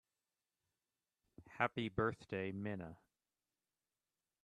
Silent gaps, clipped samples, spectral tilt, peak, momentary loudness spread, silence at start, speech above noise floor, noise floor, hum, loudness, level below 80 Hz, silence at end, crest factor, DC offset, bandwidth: none; under 0.1%; -7.5 dB/octave; -20 dBFS; 13 LU; 1.4 s; over 49 dB; under -90 dBFS; none; -42 LUFS; -72 dBFS; 1.5 s; 26 dB; under 0.1%; 11.5 kHz